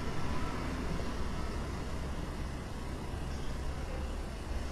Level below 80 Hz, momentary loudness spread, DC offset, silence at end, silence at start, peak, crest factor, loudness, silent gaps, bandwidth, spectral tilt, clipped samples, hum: -40 dBFS; 3 LU; under 0.1%; 0 s; 0 s; -22 dBFS; 14 dB; -40 LUFS; none; 14 kHz; -6 dB/octave; under 0.1%; none